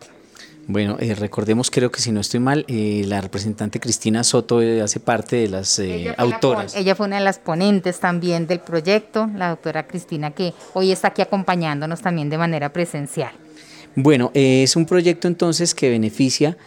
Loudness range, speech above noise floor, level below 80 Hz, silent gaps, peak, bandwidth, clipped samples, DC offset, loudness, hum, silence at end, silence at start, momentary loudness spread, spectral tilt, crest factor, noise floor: 4 LU; 25 dB; -60 dBFS; none; -4 dBFS; 17 kHz; under 0.1%; under 0.1%; -19 LUFS; none; 0.1 s; 0 s; 9 LU; -4.5 dB/octave; 16 dB; -44 dBFS